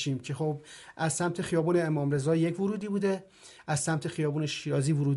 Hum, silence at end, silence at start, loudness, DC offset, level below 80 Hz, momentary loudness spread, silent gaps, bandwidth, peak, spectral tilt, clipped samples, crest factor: none; 0 s; 0 s; -30 LUFS; under 0.1%; -66 dBFS; 7 LU; none; 11.5 kHz; -16 dBFS; -5.5 dB/octave; under 0.1%; 14 dB